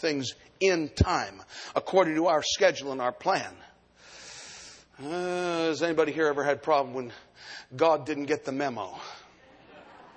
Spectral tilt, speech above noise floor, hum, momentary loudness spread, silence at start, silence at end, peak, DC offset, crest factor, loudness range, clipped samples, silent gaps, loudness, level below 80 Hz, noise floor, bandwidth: -4.5 dB/octave; 27 dB; none; 19 LU; 0 s; 0.1 s; -8 dBFS; under 0.1%; 22 dB; 5 LU; under 0.1%; none; -27 LUFS; -48 dBFS; -55 dBFS; 9.6 kHz